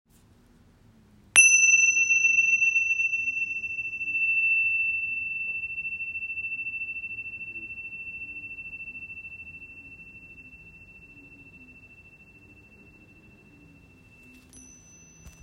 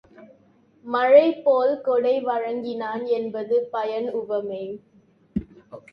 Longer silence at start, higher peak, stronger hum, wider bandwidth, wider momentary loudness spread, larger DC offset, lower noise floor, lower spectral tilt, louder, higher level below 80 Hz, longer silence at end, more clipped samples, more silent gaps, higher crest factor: first, 1.35 s vs 0.2 s; about the same, -2 dBFS vs -4 dBFS; neither; first, 12 kHz vs 5.8 kHz; first, 23 LU vs 17 LU; neither; about the same, -58 dBFS vs -58 dBFS; second, 1 dB/octave vs -8 dB/octave; about the same, -22 LUFS vs -23 LUFS; second, -62 dBFS vs -56 dBFS; about the same, 0.15 s vs 0.15 s; neither; neither; first, 26 dB vs 20 dB